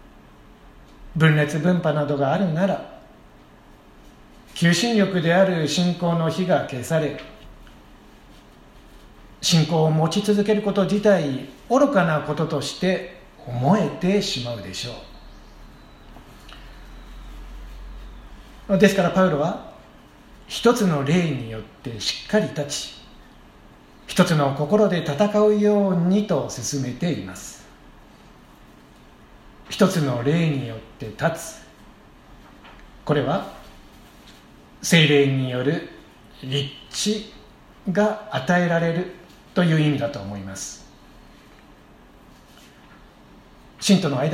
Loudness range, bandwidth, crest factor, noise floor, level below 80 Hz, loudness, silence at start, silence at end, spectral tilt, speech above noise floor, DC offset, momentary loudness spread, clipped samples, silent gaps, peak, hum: 8 LU; 15.5 kHz; 22 dB; -49 dBFS; -48 dBFS; -21 LUFS; 1 s; 0 s; -5.5 dB/octave; 28 dB; under 0.1%; 20 LU; under 0.1%; none; -2 dBFS; none